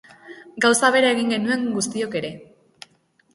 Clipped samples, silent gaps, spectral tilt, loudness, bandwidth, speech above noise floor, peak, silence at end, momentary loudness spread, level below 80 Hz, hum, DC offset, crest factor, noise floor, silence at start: under 0.1%; none; -3 dB/octave; -20 LUFS; 11.5 kHz; 41 dB; -2 dBFS; 0.9 s; 13 LU; -66 dBFS; none; under 0.1%; 20 dB; -61 dBFS; 0.25 s